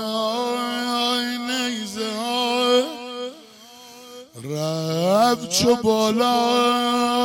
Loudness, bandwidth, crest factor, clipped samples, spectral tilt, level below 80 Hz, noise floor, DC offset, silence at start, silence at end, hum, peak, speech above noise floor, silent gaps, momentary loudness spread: -21 LUFS; 17 kHz; 14 dB; under 0.1%; -3.5 dB/octave; -58 dBFS; -45 dBFS; under 0.1%; 0 s; 0 s; none; -8 dBFS; 26 dB; none; 14 LU